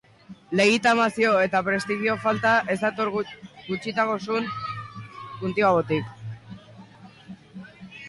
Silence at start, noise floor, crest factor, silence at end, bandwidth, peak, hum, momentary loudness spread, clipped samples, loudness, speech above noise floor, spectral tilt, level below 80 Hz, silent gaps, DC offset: 0.3 s; -47 dBFS; 16 dB; 0 s; 11.5 kHz; -10 dBFS; none; 22 LU; under 0.1%; -23 LUFS; 24 dB; -5 dB/octave; -62 dBFS; none; under 0.1%